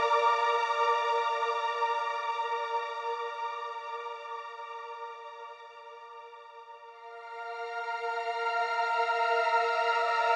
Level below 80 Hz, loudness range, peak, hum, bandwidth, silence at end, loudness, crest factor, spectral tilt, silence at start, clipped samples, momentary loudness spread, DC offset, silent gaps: under -90 dBFS; 14 LU; -14 dBFS; 50 Hz at -95 dBFS; 9.6 kHz; 0 s; -30 LUFS; 16 dB; 1 dB/octave; 0 s; under 0.1%; 20 LU; under 0.1%; none